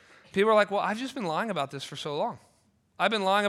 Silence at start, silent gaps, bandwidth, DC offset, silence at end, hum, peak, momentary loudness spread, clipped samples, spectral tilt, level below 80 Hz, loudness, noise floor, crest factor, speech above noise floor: 0.35 s; none; 13.5 kHz; under 0.1%; 0 s; none; -8 dBFS; 11 LU; under 0.1%; -4.5 dB/octave; -74 dBFS; -28 LUFS; -67 dBFS; 20 dB; 40 dB